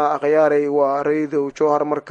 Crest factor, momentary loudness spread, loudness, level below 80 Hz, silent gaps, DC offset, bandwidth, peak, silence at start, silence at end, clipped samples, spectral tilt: 14 dB; 5 LU; -18 LUFS; -68 dBFS; none; under 0.1%; 7.6 kHz; -4 dBFS; 0 s; 0 s; under 0.1%; -7 dB/octave